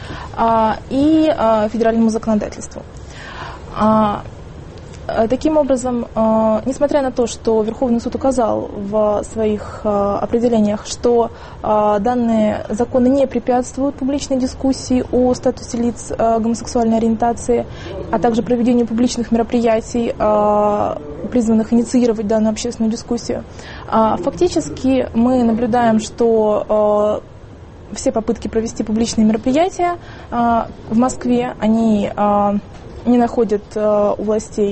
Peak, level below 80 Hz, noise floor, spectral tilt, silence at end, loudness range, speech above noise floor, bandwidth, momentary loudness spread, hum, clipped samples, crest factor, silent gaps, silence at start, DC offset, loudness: -4 dBFS; -38 dBFS; -36 dBFS; -6 dB/octave; 0 s; 2 LU; 20 dB; 8.8 kHz; 9 LU; none; under 0.1%; 12 dB; none; 0 s; under 0.1%; -17 LUFS